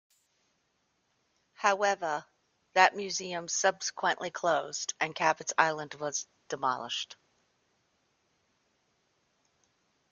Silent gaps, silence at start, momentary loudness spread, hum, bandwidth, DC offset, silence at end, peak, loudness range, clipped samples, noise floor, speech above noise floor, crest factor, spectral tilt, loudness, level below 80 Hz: none; 1.6 s; 11 LU; none; 10 kHz; under 0.1%; 3 s; -6 dBFS; 10 LU; under 0.1%; -76 dBFS; 46 dB; 26 dB; -1.5 dB/octave; -30 LUFS; -82 dBFS